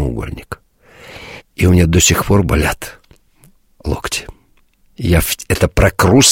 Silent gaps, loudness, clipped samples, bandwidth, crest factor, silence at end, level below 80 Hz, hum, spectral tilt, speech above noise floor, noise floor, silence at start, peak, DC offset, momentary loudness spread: none; -14 LUFS; under 0.1%; 16.5 kHz; 16 dB; 0 s; -26 dBFS; none; -4.5 dB/octave; 40 dB; -53 dBFS; 0 s; 0 dBFS; under 0.1%; 22 LU